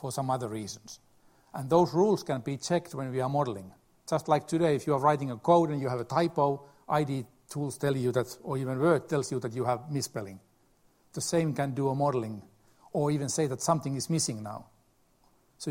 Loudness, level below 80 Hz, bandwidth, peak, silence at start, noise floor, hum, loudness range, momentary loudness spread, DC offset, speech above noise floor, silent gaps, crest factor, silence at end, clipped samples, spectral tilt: -29 LUFS; -66 dBFS; 16 kHz; -10 dBFS; 0 s; -66 dBFS; none; 4 LU; 15 LU; under 0.1%; 37 dB; none; 20 dB; 0 s; under 0.1%; -5.5 dB/octave